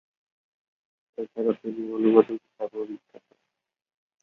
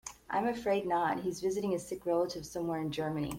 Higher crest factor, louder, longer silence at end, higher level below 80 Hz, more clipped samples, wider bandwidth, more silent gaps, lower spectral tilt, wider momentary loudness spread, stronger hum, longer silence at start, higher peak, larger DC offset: first, 24 dB vs 14 dB; first, -25 LUFS vs -34 LUFS; first, 1.25 s vs 0 s; second, -76 dBFS vs -62 dBFS; neither; second, 4.1 kHz vs 16.5 kHz; neither; first, -9 dB/octave vs -5.5 dB/octave; first, 18 LU vs 5 LU; neither; first, 1.2 s vs 0.05 s; first, -4 dBFS vs -20 dBFS; neither